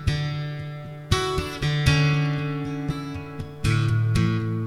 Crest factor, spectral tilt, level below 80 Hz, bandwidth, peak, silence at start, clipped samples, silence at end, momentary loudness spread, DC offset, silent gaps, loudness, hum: 20 dB; -6 dB/octave; -38 dBFS; 13 kHz; -4 dBFS; 0 s; under 0.1%; 0 s; 13 LU; under 0.1%; none; -24 LUFS; none